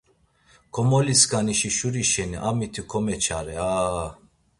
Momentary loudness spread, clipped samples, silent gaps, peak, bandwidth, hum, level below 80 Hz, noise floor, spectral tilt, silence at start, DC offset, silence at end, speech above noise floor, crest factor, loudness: 11 LU; under 0.1%; none; -4 dBFS; 11.5 kHz; none; -46 dBFS; -61 dBFS; -3.5 dB/octave; 0.75 s; under 0.1%; 0.45 s; 38 dB; 20 dB; -23 LUFS